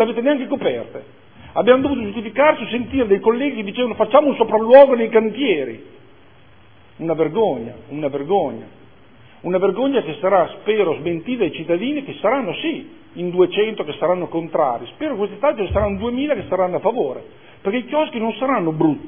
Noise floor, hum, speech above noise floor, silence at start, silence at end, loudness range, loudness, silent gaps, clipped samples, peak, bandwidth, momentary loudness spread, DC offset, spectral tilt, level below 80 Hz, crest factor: -49 dBFS; none; 31 dB; 0 s; 0 s; 7 LU; -18 LUFS; none; under 0.1%; 0 dBFS; 3.6 kHz; 11 LU; 0.4%; -10 dB/octave; -46 dBFS; 18 dB